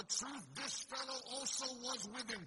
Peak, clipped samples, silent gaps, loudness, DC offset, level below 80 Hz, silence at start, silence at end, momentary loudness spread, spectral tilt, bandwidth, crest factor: -26 dBFS; under 0.1%; none; -42 LUFS; under 0.1%; -78 dBFS; 0 s; 0 s; 4 LU; -0.5 dB/octave; 11.5 kHz; 20 dB